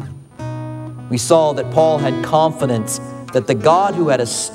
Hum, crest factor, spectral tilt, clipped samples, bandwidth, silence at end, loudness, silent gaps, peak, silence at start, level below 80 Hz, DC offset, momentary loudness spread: none; 16 dB; -5 dB/octave; under 0.1%; 15.5 kHz; 0 s; -16 LUFS; none; 0 dBFS; 0 s; -54 dBFS; under 0.1%; 15 LU